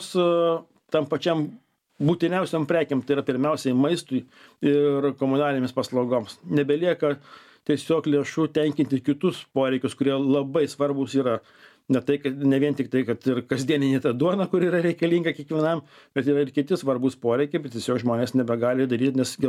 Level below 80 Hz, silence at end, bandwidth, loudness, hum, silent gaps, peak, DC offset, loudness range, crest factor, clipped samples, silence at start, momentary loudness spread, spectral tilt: -70 dBFS; 0 s; 14.5 kHz; -24 LUFS; none; none; -8 dBFS; under 0.1%; 1 LU; 16 dB; under 0.1%; 0 s; 5 LU; -6.5 dB/octave